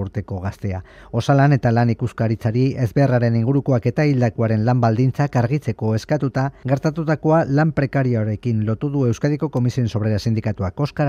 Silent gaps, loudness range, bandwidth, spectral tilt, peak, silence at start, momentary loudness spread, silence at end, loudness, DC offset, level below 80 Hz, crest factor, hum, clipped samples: none; 2 LU; 7.4 kHz; -8.5 dB/octave; -4 dBFS; 0 s; 7 LU; 0 s; -19 LUFS; under 0.1%; -48 dBFS; 14 dB; none; under 0.1%